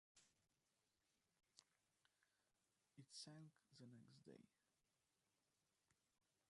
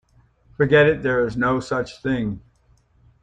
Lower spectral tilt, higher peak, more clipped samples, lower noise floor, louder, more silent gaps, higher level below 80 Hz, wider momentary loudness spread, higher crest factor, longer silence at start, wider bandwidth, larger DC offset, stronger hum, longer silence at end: second, -4 dB/octave vs -7 dB/octave; second, -46 dBFS vs -4 dBFS; neither; first, under -90 dBFS vs -59 dBFS; second, -64 LUFS vs -20 LUFS; neither; second, under -90 dBFS vs -48 dBFS; about the same, 9 LU vs 11 LU; first, 26 dB vs 18 dB; second, 0.15 s vs 0.6 s; first, 11 kHz vs 9.2 kHz; neither; neither; second, 0.55 s vs 0.85 s